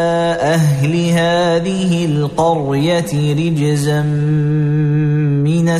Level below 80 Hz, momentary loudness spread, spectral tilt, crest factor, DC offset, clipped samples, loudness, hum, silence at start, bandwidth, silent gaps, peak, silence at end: -42 dBFS; 2 LU; -6.5 dB/octave; 10 dB; under 0.1%; under 0.1%; -15 LUFS; none; 0 s; 13.5 kHz; none; -4 dBFS; 0 s